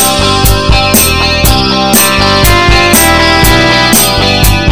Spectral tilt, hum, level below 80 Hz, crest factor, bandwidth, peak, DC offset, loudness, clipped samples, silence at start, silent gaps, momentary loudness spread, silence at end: -3 dB/octave; none; -16 dBFS; 6 dB; over 20 kHz; 0 dBFS; under 0.1%; -5 LUFS; 3%; 0 s; none; 3 LU; 0 s